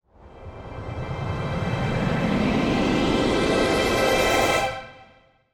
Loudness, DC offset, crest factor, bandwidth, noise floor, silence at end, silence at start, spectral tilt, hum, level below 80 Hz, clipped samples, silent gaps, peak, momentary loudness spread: -22 LUFS; under 0.1%; 16 dB; 20 kHz; -55 dBFS; 0.5 s; 0.25 s; -5 dB/octave; none; -38 dBFS; under 0.1%; none; -8 dBFS; 17 LU